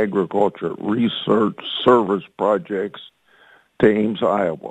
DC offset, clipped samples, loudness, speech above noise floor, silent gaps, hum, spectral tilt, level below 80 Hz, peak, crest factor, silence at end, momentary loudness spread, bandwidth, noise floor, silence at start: under 0.1%; under 0.1%; -20 LUFS; 34 dB; none; none; -7.5 dB/octave; -56 dBFS; 0 dBFS; 18 dB; 0 s; 10 LU; 8.8 kHz; -53 dBFS; 0 s